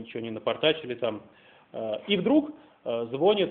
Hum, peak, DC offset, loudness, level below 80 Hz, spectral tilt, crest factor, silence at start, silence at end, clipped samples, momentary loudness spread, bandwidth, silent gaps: none; -10 dBFS; under 0.1%; -27 LUFS; -68 dBFS; -3.5 dB/octave; 18 dB; 0 s; 0 s; under 0.1%; 16 LU; 4.3 kHz; none